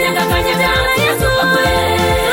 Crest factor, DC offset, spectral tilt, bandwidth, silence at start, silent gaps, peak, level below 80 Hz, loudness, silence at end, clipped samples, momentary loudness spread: 10 dB; under 0.1%; -4 dB/octave; 17 kHz; 0 s; none; -4 dBFS; -26 dBFS; -13 LUFS; 0 s; under 0.1%; 2 LU